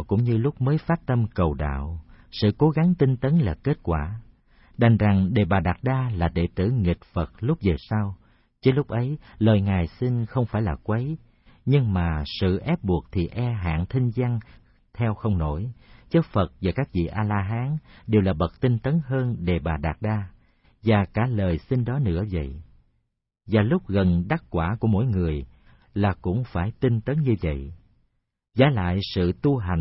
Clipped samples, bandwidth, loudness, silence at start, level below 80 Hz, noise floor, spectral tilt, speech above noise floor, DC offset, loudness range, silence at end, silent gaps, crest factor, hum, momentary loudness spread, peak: under 0.1%; 5.8 kHz; -24 LUFS; 0 s; -40 dBFS; -74 dBFS; -12 dB/octave; 52 dB; under 0.1%; 3 LU; 0 s; none; 18 dB; none; 10 LU; -4 dBFS